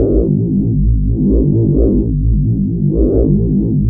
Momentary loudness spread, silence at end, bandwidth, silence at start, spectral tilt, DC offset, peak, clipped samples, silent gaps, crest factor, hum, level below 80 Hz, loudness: 3 LU; 0 s; 1.3 kHz; 0 s; -16.5 dB/octave; under 0.1%; -2 dBFS; under 0.1%; none; 10 dB; none; -18 dBFS; -14 LUFS